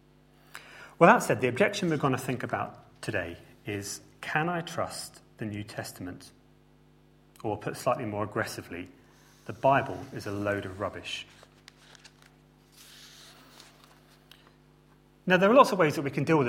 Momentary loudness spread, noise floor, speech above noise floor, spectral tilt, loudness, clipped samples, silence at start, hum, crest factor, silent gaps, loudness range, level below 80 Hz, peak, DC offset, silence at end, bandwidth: 26 LU; -60 dBFS; 32 dB; -5.5 dB/octave; -28 LUFS; under 0.1%; 0.55 s; none; 26 dB; none; 11 LU; -64 dBFS; -4 dBFS; under 0.1%; 0 s; 16.5 kHz